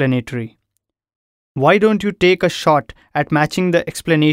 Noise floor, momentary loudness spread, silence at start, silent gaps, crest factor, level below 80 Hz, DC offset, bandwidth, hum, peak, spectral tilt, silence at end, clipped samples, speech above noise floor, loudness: -74 dBFS; 13 LU; 0 s; 1.16-1.55 s; 16 dB; -50 dBFS; under 0.1%; 16 kHz; none; 0 dBFS; -6 dB/octave; 0 s; under 0.1%; 58 dB; -16 LUFS